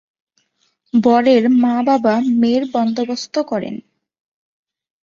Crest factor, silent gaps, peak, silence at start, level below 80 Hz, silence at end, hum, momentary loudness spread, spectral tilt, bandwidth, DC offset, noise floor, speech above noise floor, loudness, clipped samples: 16 dB; none; -2 dBFS; 0.95 s; -62 dBFS; 1.25 s; none; 10 LU; -6 dB/octave; 7.4 kHz; under 0.1%; -65 dBFS; 50 dB; -16 LUFS; under 0.1%